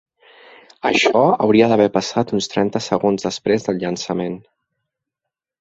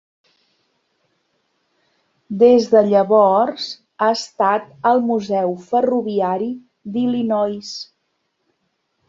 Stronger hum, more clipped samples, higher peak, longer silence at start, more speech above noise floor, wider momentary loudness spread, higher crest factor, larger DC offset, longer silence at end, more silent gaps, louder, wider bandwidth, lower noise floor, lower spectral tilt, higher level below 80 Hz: neither; neither; about the same, -2 dBFS vs -2 dBFS; second, 0.85 s vs 2.3 s; first, 66 dB vs 54 dB; second, 10 LU vs 16 LU; about the same, 18 dB vs 18 dB; neither; about the same, 1.2 s vs 1.25 s; neither; about the same, -18 LUFS vs -17 LUFS; about the same, 8 kHz vs 7.8 kHz; first, -84 dBFS vs -70 dBFS; about the same, -5 dB/octave vs -5.5 dB/octave; first, -58 dBFS vs -64 dBFS